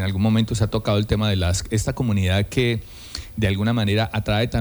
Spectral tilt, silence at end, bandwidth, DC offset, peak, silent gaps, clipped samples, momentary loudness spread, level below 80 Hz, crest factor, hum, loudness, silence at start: -5.5 dB/octave; 0 s; over 20 kHz; under 0.1%; -6 dBFS; none; under 0.1%; 5 LU; -36 dBFS; 14 dB; none; -21 LUFS; 0 s